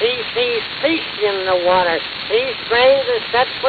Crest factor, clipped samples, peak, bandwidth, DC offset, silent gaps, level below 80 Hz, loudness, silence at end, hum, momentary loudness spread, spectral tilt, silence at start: 14 dB; under 0.1%; -2 dBFS; 4.8 kHz; under 0.1%; none; -52 dBFS; -17 LUFS; 0 s; none; 6 LU; -5.5 dB/octave; 0 s